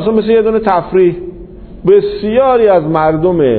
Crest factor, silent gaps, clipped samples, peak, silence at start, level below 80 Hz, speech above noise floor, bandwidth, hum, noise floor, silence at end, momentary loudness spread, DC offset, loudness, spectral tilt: 10 dB; none; under 0.1%; 0 dBFS; 0 s; -36 dBFS; 20 dB; 4.5 kHz; none; -30 dBFS; 0 s; 5 LU; under 0.1%; -11 LUFS; -10.5 dB/octave